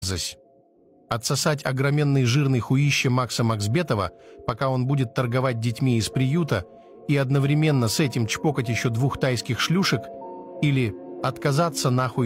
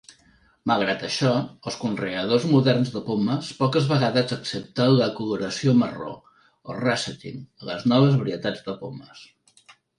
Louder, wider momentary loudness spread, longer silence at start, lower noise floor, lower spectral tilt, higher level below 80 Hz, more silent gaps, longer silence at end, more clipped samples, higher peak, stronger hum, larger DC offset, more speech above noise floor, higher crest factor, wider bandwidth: about the same, -23 LUFS vs -23 LUFS; second, 9 LU vs 16 LU; second, 0 s vs 0.65 s; about the same, -57 dBFS vs -59 dBFS; about the same, -5.5 dB/octave vs -6 dB/octave; first, -52 dBFS vs -62 dBFS; neither; second, 0 s vs 0.75 s; neither; second, -10 dBFS vs -6 dBFS; neither; neither; about the same, 34 dB vs 36 dB; about the same, 14 dB vs 18 dB; first, 16 kHz vs 11 kHz